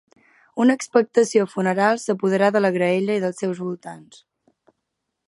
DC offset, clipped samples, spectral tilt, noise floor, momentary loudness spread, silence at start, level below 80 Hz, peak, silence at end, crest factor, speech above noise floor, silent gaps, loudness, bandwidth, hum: under 0.1%; under 0.1%; -5.5 dB/octave; -79 dBFS; 12 LU; 0.55 s; -74 dBFS; -2 dBFS; 1.3 s; 18 dB; 59 dB; none; -20 LUFS; 11.5 kHz; none